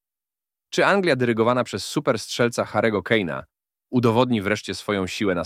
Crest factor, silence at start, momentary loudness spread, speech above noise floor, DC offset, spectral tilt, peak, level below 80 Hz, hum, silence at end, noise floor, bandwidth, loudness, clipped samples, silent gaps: 20 dB; 0.7 s; 7 LU; over 69 dB; under 0.1%; -5 dB/octave; -4 dBFS; -60 dBFS; none; 0 s; under -90 dBFS; 15.5 kHz; -22 LUFS; under 0.1%; none